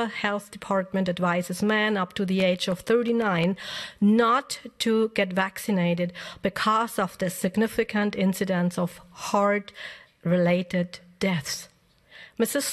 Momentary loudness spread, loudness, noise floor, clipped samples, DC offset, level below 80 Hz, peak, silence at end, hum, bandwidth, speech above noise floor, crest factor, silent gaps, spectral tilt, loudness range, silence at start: 10 LU; -25 LUFS; -52 dBFS; under 0.1%; under 0.1%; -62 dBFS; -8 dBFS; 0 s; none; 13 kHz; 27 dB; 16 dB; none; -5 dB/octave; 3 LU; 0 s